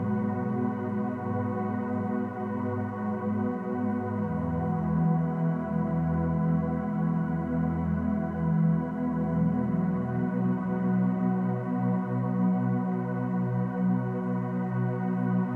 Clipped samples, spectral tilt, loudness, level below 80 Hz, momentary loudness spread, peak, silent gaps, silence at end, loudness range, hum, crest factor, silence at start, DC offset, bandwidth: under 0.1%; -11.5 dB/octave; -29 LUFS; -50 dBFS; 4 LU; -16 dBFS; none; 0 s; 3 LU; 60 Hz at -55 dBFS; 12 dB; 0 s; under 0.1%; 3.2 kHz